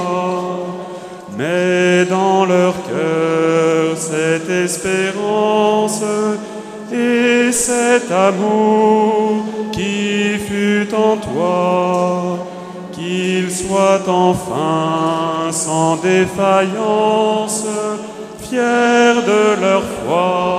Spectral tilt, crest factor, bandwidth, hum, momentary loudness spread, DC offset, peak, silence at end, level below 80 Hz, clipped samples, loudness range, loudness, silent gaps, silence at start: -4.5 dB/octave; 14 dB; 15.5 kHz; none; 10 LU; under 0.1%; 0 dBFS; 0 s; -52 dBFS; under 0.1%; 3 LU; -15 LUFS; none; 0 s